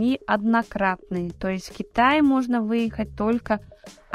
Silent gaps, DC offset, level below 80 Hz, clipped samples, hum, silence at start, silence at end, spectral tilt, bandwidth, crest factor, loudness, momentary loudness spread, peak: none; under 0.1%; -48 dBFS; under 0.1%; none; 0 s; 0 s; -6.5 dB/octave; 12.5 kHz; 16 dB; -23 LUFS; 10 LU; -6 dBFS